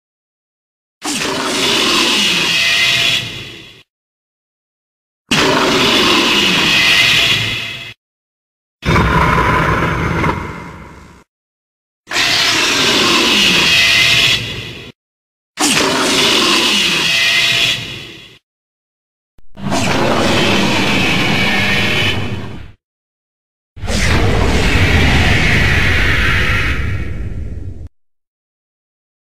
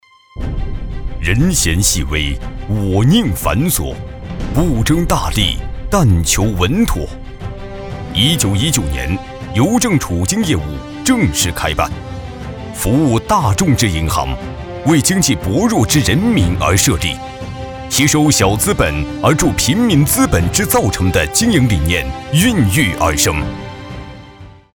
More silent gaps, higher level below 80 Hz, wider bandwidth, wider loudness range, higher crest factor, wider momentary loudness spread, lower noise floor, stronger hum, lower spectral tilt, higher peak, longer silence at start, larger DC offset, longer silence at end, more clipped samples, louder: first, 3.90-5.25 s, 7.97-8.79 s, 11.28-12.04 s, 14.95-15.54 s, 18.43-19.38 s, 22.84-23.76 s vs none; about the same, -28 dBFS vs -26 dBFS; second, 16 kHz vs over 20 kHz; first, 6 LU vs 3 LU; about the same, 16 dB vs 14 dB; about the same, 17 LU vs 15 LU; about the same, -37 dBFS vs -37 dBFS; neither; second, -3 dB/octave vs -4.5 dB/octave; about the same, 0 dBFS vs 0 dBFS; first, 1 s vs 0.35 s; neither; first, 1.05 s vs 0.2 s; neither; first, -11 LUFS vs -14 LUFS